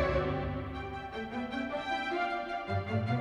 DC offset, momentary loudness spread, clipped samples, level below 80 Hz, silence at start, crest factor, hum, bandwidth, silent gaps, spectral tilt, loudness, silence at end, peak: under 0.1%; 7 LU; under 0.1%; -48 dBFS; 0 s; 16 dB; none; 10 kHz; none; -7 dB/octave; -35 LUFS; 0 s; -18 dBFS